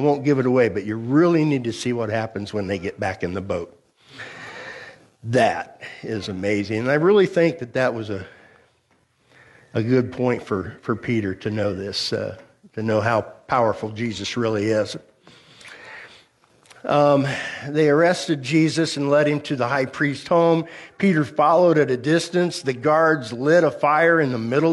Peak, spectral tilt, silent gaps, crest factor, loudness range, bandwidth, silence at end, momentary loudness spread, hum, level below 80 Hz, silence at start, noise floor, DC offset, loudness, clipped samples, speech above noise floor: -6 dBFS; -6 dB/octave; none; 16 dB; 7 LU; 11.5 kHz; 0 s; 16 LU; none; -60 dBFS; 0 s; -63 dBFS; under 0.1%; -21 LUFS; under 0.1%; 43 dB